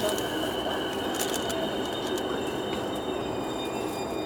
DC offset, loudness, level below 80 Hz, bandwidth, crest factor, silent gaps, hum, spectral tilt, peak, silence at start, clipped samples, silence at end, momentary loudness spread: under 0.1%; -30 LUFS; -52 dBFS; over 20 kHz; 18 dB; none; none; -3.5 dB/octave; -12 dBFS; 0 s; under 0.1%; 0 s; 3 LU